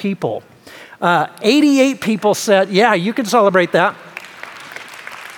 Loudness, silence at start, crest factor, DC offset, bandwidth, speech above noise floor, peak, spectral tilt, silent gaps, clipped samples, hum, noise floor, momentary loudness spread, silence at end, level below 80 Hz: -15 LUFS; 0 s; 16 dB; under 0.1%; 18.5 kHz; 20 dB; 0 dBFS; -4.5 dB/octave; none; under 0.1%; none; -34 dBFS; 19 LU; 0 s; -68 dBFS